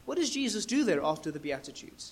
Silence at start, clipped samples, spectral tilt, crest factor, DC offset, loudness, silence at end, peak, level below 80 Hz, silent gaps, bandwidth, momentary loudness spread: 0 s; under 0.1%; -3.5 dB/octave; 16 dB; under 0.1%; -31 LUFS; 0 s; -16 dBFS; -64 dBFS; none; 15.5 kHz; 12 LU